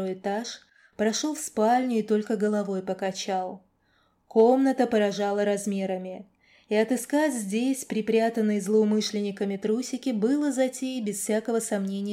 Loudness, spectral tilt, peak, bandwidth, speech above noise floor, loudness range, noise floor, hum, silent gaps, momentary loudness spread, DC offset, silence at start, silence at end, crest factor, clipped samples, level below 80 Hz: -26 LUFS; -5 dB/octave; -10 dBFS; 16 kHz; 42 dB; 2 LU; -67 dBFS; none; none; 8 LU; under 0.1%; 0 s; 0 s; 16 dB; under 0.1%; -74 dBFS